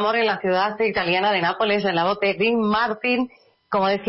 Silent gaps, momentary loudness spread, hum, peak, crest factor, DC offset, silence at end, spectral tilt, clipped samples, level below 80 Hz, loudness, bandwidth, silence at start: none; 3 LU; none; -10 dBFS; 12 dB; under 0.1%; 0 s; -9 dB/octave; under 0.1%; -58 dBFS; -21 LUFS; 5.8 kHz; 0 s